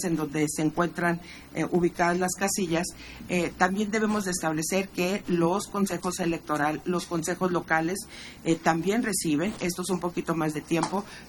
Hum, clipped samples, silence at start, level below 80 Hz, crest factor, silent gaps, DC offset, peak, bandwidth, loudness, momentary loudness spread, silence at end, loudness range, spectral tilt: none; under 0.1%; 0 s; -54 dBFS; 20 dB; none; under 0.1%; -8 dBFS; 19.5 kHz; -27 LUFS; 5 LU; 0 s; 1 LU; -4.5 dB/octave